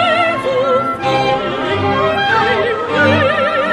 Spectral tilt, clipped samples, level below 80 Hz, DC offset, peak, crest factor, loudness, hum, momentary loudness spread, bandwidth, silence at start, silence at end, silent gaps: -5.5 dB/octave; under 0.1%; -46 dBFS; under 0.1%; -2 dBFS; 12 dB; -14 LUFS; none; 4 LU; 12 kHz; 0 s; 0 s; none